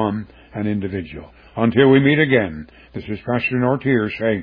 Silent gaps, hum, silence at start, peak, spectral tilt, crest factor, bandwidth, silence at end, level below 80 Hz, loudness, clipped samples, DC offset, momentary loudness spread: none; none; 0 s; -2 dBFS; -10 dB/octave; 16 dB; 5.2 kHz; 0 s; -48 dBFS; -18 LUFS; under 0.1%; under 0.1%; 21 LU